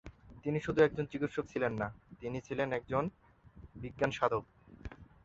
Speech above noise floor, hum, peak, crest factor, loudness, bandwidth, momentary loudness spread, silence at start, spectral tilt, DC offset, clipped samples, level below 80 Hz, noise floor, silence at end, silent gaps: 22 dB; none; -14 dBFS; 22 dB; -35 LUFS; 7.8 kHz; 21 LU; 0.05 s; -5.5 dB/octave; under 0.1%; under 0.1%; -58 dBFS; -57 dBFS; 0.2 s; none